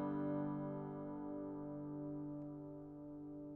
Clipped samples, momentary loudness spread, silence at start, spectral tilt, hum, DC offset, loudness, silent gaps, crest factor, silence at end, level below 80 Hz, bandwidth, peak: under 0.1%; 11 LU; 0 s; -10.5 dB/octave; none; under 0.1%; -47 LUFS; none; 14 dB; 0 s; -72 dBFS; 3.3 kHz; -32 dBFS